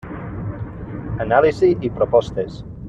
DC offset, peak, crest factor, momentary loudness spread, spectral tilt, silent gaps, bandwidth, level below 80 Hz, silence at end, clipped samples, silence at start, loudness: under 0.1%; -2 dBFS; 18 dB; 15 LU; -8 dB/octave; none; 8 kHz; -40 dBFS; 0 s; under 0.1%; 0.05 s; -19 LUFS